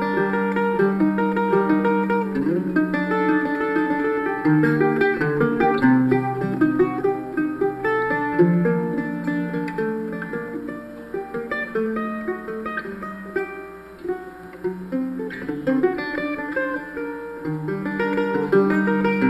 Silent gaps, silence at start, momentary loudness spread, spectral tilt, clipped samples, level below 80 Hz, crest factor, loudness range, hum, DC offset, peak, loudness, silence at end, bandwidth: none; 0 s; 12 LU; -8.5 dB/octave; under 0.1%; -54 dBFS; 16 dB; 9 LU; none; under 0.1%; -6 dBFS; -22 LUFS; 0 s; 13.5 kHz